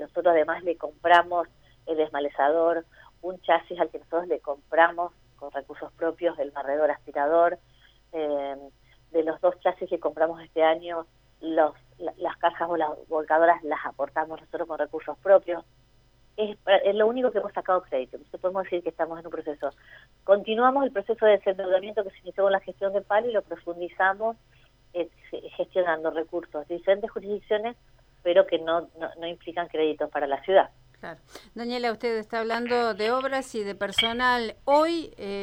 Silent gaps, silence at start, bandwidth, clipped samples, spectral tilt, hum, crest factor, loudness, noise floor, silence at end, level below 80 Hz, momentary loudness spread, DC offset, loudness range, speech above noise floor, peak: none; 0 s; 12 kHz; under 0.1%; -4.5 dB/octave; none; 22 dB; -26 LUFS; -60 dBFS; 0 s; -62 dBFS; 14 LU; under 0.1%; 3 LU; 34 dB; -4 dBFS